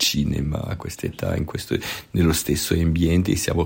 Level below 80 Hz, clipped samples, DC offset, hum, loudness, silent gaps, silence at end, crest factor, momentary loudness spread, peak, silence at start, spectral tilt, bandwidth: -38 dBFS; under 0.1%; under 0.1%; none; -23 LUFS; none; 0 s; 16 dB; 8 LU; -6 dBFS; 0 s; -5 dB/octave; 16.5 kHz